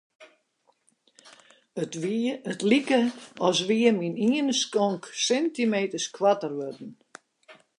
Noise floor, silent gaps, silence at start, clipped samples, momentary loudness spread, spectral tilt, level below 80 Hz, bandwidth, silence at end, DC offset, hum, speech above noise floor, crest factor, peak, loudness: -69 dBFS; none; 0.2 s; under 0.1%; 12 LU; -4 dB/octave; -78 dBFS; 11 kHz; 0.25 s; under 0.1%; none; 44 dB; 20 dB; -8 dBFS; -25 LUFS